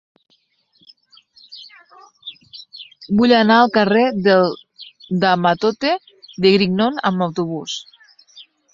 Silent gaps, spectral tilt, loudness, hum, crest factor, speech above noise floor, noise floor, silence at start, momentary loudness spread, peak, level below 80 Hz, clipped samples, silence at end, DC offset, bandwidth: none; -6 dB/octave; -16 LUFS; none; 18 dB; 46 dB; -61 dBFS; 1.5 s; 24 LU; -2 dBFS; -58 dBFS; under 0.1%; 0.3 s; under 0.1%; 7.6 kHz